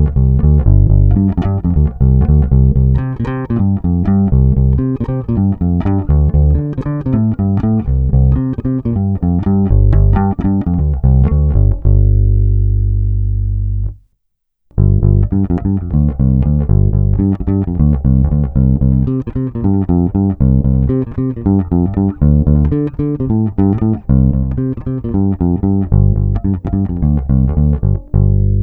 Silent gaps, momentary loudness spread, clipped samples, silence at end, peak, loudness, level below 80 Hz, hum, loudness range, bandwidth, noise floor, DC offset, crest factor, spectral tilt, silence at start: none; 6 LU; under 0.1%; 0 s; 0 dBFS; -14 LUFS; -16 dBFS; 50 Hz at -25 dBFS; 2 LU; 3 kHz; -67 dBFS; under 0.1%; 12 dB; -13 dB/octave; 0 s